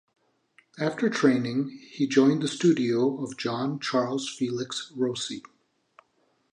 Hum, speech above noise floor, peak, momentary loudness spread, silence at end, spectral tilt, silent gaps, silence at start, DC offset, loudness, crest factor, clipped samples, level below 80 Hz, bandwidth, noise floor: none; 44 dB; -6 dBFS; 10 LU; 1.15 s; -5 dB/octave; none; 0.75 s; under 0.1%; -26 LUFS; 20 dB; under 0.1%; -74 dBFS; 10.5 kHz; -69 dBFS